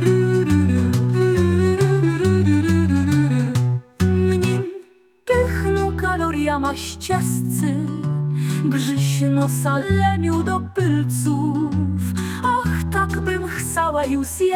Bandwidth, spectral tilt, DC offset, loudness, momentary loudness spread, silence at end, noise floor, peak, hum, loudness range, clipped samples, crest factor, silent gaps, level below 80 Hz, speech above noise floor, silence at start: 17.5 kHz; -6.5 dB/octave; under 0.1%; -20 LUFS; 6 LU; 0 s; -45 dBFS; -4 dBFS; none; 4 LU; under 0.1%; 14 dB; none; -42 dBFS; 26 dB; 0 s